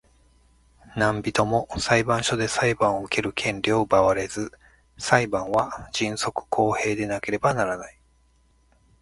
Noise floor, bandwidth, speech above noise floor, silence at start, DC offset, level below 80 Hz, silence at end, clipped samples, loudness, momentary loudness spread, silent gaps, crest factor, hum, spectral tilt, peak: -61 dBFS; 11.5 kHz; 38 dB; 0.9 s; under 0.1%; -50 dBFS; 1.1 s; under 0.1%; -24 LUFS; 8 LU; none; 24 dB; none; -4.5 dB/octave; 0 dBFS